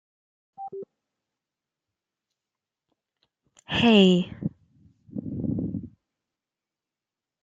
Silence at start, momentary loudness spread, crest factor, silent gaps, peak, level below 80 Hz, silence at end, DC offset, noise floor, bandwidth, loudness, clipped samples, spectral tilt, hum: 0.6 s; 22 LU; 24 dB; none; -4 dBFS; -58 dBFS; 1.55 s; under 0.1%; -90 dBFS; 7.6 kHz; -23 LUFS; under 0.1%; -6.5 dB/octave; none